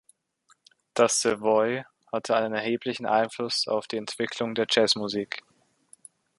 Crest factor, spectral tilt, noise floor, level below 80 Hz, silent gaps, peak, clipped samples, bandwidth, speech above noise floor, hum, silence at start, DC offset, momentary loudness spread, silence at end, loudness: 22 dB; -2.5 dB/octave; -66 dBFS; -72 dBFS; none; -6 dBFS; under 0.1%; 11.5 kHz; 40 dB; none; 0.95 s; under 0.1%; 12 LU; 1 s; -26 LUFS